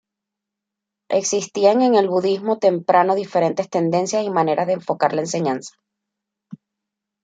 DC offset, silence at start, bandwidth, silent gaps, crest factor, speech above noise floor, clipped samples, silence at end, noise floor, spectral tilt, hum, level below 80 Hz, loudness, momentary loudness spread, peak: under 0.1%; 1.1 s; 9.4 kHz; none; 18 dB; 65 dB; under 0.1%; 0.7 s; -84 dBFS; -5 dB/octave; none; -70 dBFS; -19 LUFS; 6 LU; -2 dBFS